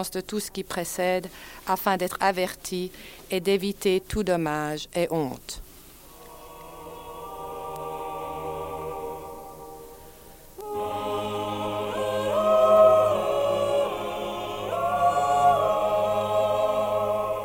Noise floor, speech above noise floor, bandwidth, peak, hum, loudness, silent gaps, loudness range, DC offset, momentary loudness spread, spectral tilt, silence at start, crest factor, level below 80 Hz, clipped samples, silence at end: -48 dBFS; 21 dB; 17 kHz; -8 dBFS; none; -25 LUFS; none; 13 LU; under 0.1%; 20 LU; -4.5 dB/octave; 0 s; 18 dB; -52 dBFS; under 0.1%; 0 s